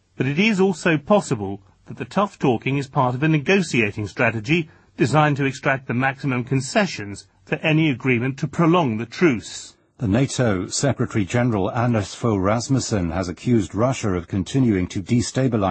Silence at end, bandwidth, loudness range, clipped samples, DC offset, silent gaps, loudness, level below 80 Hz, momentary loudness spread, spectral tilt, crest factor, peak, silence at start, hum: 0 s; 8.8 kHz; 2 LU; under 0.1%; under 0.1%; none; -21 LUFS; -50 dBFS; 8 LU; -6 dB/octave; 16 dB; -4 dBFS; 0.2 s; none